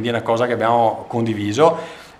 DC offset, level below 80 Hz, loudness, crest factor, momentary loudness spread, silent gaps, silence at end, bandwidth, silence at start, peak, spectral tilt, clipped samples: under 0.1%; -60 dBFS; -18 LUFS; 18 dB; 7 LU; none; 0.1 s; 13 kHz; 0 s; 0 dBFS; -6 dB/octave; under 0.1%